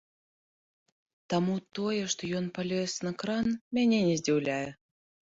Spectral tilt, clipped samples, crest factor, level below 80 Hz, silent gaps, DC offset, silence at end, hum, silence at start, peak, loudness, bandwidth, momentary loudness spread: -5 dB/octave; under 0.1%; 16 dB; -66 dBFS; 3.61-3.71 s; under 0.1%; 0.6 s; none; 1.3 s; -16 dBFS; -30 LUFS; 8 kHz; 7 LU